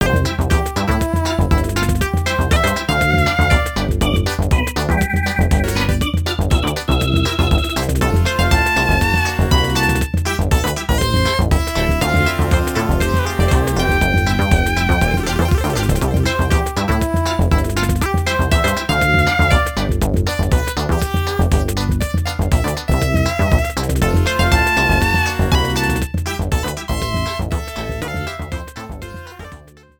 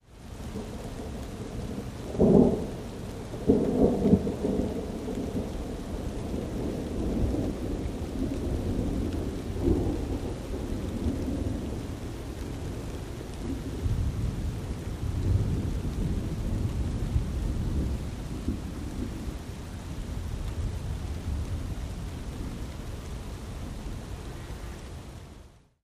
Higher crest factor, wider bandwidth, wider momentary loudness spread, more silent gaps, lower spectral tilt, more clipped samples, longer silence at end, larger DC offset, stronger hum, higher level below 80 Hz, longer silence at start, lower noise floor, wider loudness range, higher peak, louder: second, 14 dB vs 24 dB; first, 19 kHz vs 15.5 kHz; second, 6 LU vs 13 LU; neither; second, -5 dB/octave vs -7.5 dB/octave; neither; about the same, 0.35 s vs 0.25 s; neither; neither; first, -22 dBFS vs -36 dBFS; about the same, 0 s vs 0.1 s; second, -40 dBFS vs -52 dBFS; second, 2 LU vs 10 LU; first, -2 dBFS vs -6 dBFS; first, -17 LUFS vs -31 LUFS